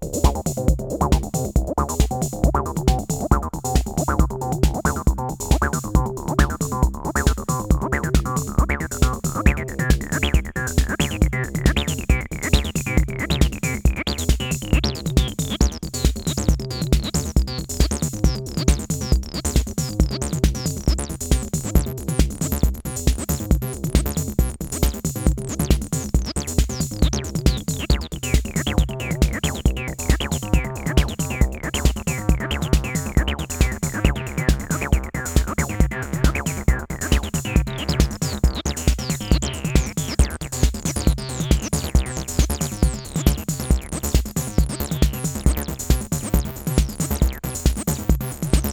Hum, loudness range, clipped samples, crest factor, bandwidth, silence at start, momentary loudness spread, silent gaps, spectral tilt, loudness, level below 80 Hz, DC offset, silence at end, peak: none; 1 LU; under 0.1%; 20 dB; 19 kHz; 0 s; 3 LU; none; -5 dB/octave; -22 LUFS; -24 dBFS; under 0.1%; 0 s; 0 dBFS